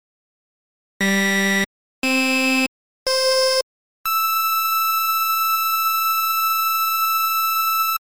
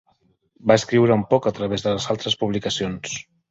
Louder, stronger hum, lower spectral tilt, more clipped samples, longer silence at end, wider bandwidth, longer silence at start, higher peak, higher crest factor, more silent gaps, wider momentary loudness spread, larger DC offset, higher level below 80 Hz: first, -18 LUFS vs -21 LUFS; neither; second, -2.5 dB/octave vs -5 dB/octave; neither; second, 0.05 s vs 0.3 s; first, over 20 kHz vs 8 kHz; first, 1 s vs 0.65 s; second, -10 dBFS vs -2 dBFS; second, 10 dB vs 20 dB; first, 1.66-2.02 s, 2.68-3.06 s, 3.63-4.04 s vs none; second, 6 LU vs 10 LU; first, 0.6% vs under 0.1%; second, -62 dBFS vs -52 dBFS